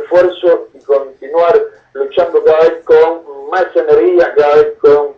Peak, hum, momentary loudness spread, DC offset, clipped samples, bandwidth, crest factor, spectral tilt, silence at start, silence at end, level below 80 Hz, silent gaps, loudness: 0 dBFS; none; 8 LU; under 0.1%; under 0.1%; 6.4 kHz; 10 dB; -6 dB/octave; 0 s; 0.05 s; -50 dBFS; none; -11 LUFS